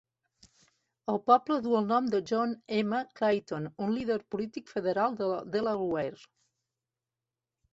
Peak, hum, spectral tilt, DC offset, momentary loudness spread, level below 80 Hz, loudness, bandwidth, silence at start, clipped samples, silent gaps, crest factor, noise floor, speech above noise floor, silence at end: -8 dBFS; none; -6.5 dB/octave; under 0.1%; 11 LU; -70 dBFS; -30 LUFS; 8 kHz; 1.1 s; under 0.1%; none; 22 dB; under -90 dBFS; over 60 dB; 1.6 s